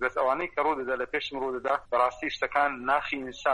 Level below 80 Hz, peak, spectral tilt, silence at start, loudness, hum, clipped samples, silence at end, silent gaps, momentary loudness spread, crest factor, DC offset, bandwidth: -58 dBFS; -10 dBFS; -4 dB/octave; 0 s; -28 LUFS; none; under 0.1%; 0 s; none; 5 LU; 18 dB; under 0.1%; 11.5 kHz